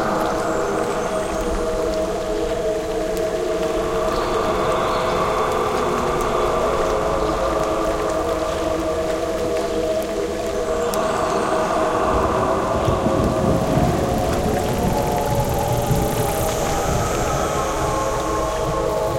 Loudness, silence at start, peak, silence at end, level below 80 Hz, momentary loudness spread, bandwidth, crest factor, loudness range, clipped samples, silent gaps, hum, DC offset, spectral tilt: -21 LUFS; 0 s; -2 dBFS; 0 s; -32 dBFS; 4 LU; 17 kHz; 18 dB; 3 LU; under 0.1%; none; none; under 0.1%; -5 dB/octave